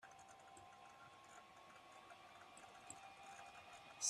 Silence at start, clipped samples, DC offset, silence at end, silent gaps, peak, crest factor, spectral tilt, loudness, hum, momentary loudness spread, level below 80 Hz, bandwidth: 0 s; under 0.1%; under 0.1%; 0 s; none; -26 dBFS; 30 dB; 0 dB/octave; -60 LUFS; none; 5 LU; -88 dBFS; 13.5 kHz